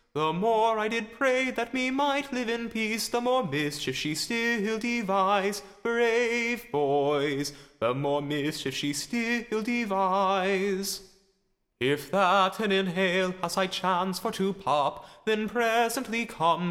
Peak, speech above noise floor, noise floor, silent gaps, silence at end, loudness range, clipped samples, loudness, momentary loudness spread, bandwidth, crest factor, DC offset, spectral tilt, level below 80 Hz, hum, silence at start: -10 dBFS; 46 dB; -73 dBFS; none; 0 s; 2 LU; under 0.1%; -27 LUFS; 6 LU; 16 kHz; 16 dB; under 0.1%; -4 dB/octave; -62 dBFS; none; 0.15 s